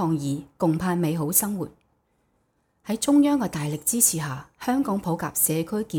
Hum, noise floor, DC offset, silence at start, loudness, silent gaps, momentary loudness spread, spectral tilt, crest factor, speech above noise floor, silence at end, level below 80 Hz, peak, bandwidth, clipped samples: none; -69 dBFS; under 0.1%; 0 s; -23 LUFS; none; 12 LU; -4.5 dB/octave; 20 dB; 46 dB; 0 s; -58 dBFS; -4 dBFS; over 20 kHz; under 0.1%